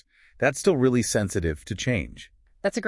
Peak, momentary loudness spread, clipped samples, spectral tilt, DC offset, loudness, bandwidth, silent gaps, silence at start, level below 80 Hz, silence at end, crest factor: -8 dBFS; 8 LU; under 0.1%; -5 dB/octave; under 0.1%; -25 LUFS; 12 kHz; none; 0.4 s; -46 dBFS; 0 s; 18 dB